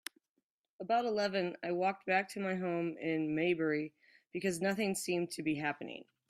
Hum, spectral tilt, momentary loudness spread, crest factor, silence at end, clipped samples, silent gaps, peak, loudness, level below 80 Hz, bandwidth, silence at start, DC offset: none; -5 dB/octave; 10 LU; 18 dB; 0.3 s; under 0.1%; none; -18 dBFS; -35 LUFS; -78 dBFS; 15.5 kHz; 0.8 s; under 0.1%